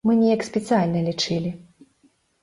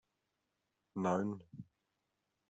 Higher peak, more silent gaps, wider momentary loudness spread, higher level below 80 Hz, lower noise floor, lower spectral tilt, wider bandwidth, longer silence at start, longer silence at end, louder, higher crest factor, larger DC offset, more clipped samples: first, -8 dBFS vs -20 dBFS; neither; second, 10 LU vs 20 LU; first, -60 dBFS vs -82 dBFS; second, -62 dBFS vs -86 dBFS; second, -6 dB/octave vs -7.5 dB/octave; first, 11.5 kHz vs 8 kHz; second, 0.05 s vs 0.95 s; about the same, 0.8 s vs 0.85 s; first, -22 LUFS vs -39 LUFS; second, 14 dB vs 22 dB; neither; neither